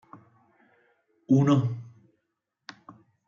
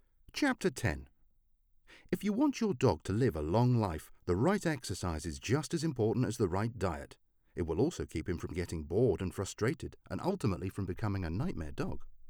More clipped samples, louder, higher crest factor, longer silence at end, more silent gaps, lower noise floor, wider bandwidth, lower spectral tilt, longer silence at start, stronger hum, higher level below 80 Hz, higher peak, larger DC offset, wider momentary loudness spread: neither; first, -24 LUFS vs -34 LUFS; about the same, 20 dB vs 20 dB; first, 1.45 s vs 0 s; neither; first, -81 dBFS vs -69 dBFS; second, 7.2 kHz vs 18.5 kHz; first, -8.5 dB/octave vs -6.5 dB/octave; first, 1.3 s vs 0.35 s; neither; second, -72 dBFS vs -50 dBFS; first, -10 dBFS vs -14 dBFS; neither; first, 27 LU vs 9 LU